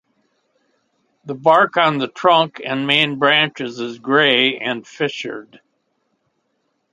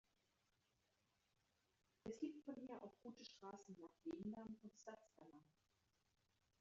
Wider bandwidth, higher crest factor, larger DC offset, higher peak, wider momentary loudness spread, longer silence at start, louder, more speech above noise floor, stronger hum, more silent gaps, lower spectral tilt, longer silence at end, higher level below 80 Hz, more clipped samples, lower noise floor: first, 11 kHz vs 7.4 kHz; about the same, 20 dB vs 22 dB; neither; first, 0 dBFS vs -36 dBFS; first, 14 LU vs 11 LU; second, 1.25 s vs 2.05 s; first, -16 LUFS vs -56 LUFS; first, 52 dB vs 30 dB; neither; neither; about the same, -5 dB/octave vs -5.5 dB/octave; first, 1.5 s vs 1.15 s; first, -70 dBFS vs -86 dBFS; neither; second, -69 dBFS vs -86 dBFS